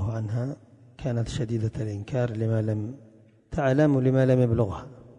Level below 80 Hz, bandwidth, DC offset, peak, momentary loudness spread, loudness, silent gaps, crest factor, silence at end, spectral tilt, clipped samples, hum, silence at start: -46 dBFS; 9.8 kHz; under 0.1%; -10 dBFS; 14 LU; -26 LUFS; none; 16 dB; 0.05 s; -8.5 dB/octave; under 0.1%; none; 0 s